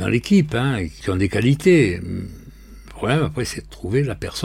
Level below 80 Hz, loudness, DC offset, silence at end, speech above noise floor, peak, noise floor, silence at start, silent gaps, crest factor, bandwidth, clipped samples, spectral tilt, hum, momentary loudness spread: -40 dBFS; -20 LUFS; under 0.1%; 0 s; 21 dB; -4 dBFS; -41 dBFS; 0 s; none; 16 dB; 16 kHz; under 0.1%; -6.5 dB/octave; none; 14 LU